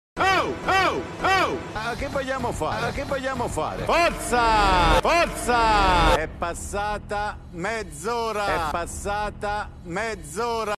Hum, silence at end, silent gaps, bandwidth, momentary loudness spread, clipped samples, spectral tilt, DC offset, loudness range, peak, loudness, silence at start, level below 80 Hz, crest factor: none; 0.05 s; none; 13.5 kHz; 10 LU; under 0.1%; -4 dB/octave; under 0.1%; 7 LU; -6 dBFS; -23 LUFS; 0.15 s; -34 dBFS; 18 dB